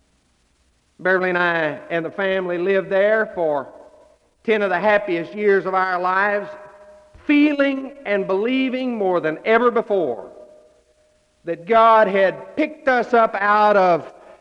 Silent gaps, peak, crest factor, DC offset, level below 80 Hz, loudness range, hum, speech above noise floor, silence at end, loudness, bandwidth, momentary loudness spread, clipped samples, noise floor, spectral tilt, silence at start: none; -4 dBFS; 16 dB; under 0.1%; -62 dBFS; 4 LU; none; 44 dB; 0.3 s; -19 LUFS; 8.6 kHz; 11 LU; under 0.1%; -62 dBFS; -7 dB/octave; 1 s